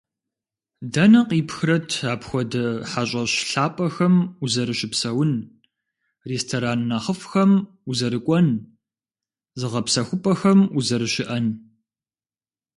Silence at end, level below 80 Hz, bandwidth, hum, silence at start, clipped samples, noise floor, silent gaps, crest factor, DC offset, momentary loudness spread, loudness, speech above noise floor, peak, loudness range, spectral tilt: 1.2 s; -60 dBFS; 11.5 kHz; none; 0.8 s; under 0.1%; under -90 dBFS; none; 18 dB; under 0.1%; 10 LU; -21 LUFS; over 69 dB; -4 dBFS; 2 LU; -5.5 dB/octave